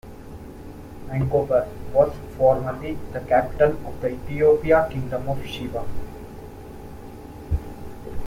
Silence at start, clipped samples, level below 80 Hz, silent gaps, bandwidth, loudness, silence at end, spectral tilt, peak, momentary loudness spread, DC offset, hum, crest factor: 0.05 s; under 0.1%; -38 dBFS; none; 16.5 kHz; -23 LUFS; 0 s; -7.5 dB/octave; -4 dBFS; 21 LU; under 0.1%; none; 20 dB